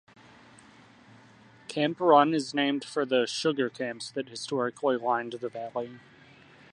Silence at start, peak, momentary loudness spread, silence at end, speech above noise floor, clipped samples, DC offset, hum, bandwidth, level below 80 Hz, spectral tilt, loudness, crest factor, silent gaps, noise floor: 1.7 s; -6 dBFS; 15 LU; 0.75 s; 28 dB; under 0.1%; under 0.1%; none; 11.5 kHz; -78 dBFS; -4.5 dB/octave; -28 LUFS; 22 dB; none; -55 dBFS